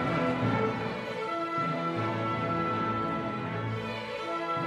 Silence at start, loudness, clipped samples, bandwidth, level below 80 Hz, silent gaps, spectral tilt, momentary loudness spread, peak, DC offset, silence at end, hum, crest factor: 0 s; -31 LUFS; under 0.1%; 12 kHz; -60 dBFS; none; -7 dB/octave; 6 LU; -16 dBFS; under 0.1%; 0 s; none; 14 dB